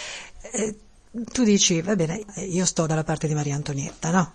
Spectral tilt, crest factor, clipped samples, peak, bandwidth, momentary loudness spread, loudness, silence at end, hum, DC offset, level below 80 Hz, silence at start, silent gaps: -4 dB/octave; 18 dB; under 0.1%; -6 dBFS; 10.5 kHz; 14 LU; -24 LUFS; 0.05 s; none; under 0.1%; -50 dBFS; 0 s; none